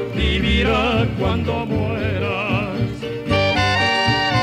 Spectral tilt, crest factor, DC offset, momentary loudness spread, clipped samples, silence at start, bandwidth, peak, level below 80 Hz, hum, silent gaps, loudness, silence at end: -6 dB/octave; 14 dB; under 0.1%; 6 LU; under 0.1%; 0 s; 13.5 kHz; -6 dBFS; -30 dBFS; none; none; -19 LUFS; 0 s